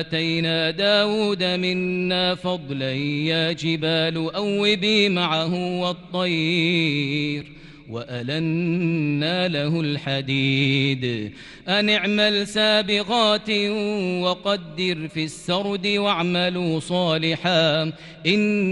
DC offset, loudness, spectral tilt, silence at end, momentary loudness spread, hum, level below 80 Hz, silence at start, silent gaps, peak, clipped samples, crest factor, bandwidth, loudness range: under 0.1%; -21 LUFS; -5.5 dB/octave; 0 s; 8 LU; none; -56 dBFS; 0 s; none; -4 dBFS; under 0.1%; 18 dB; 11.5 kHz; 3 LU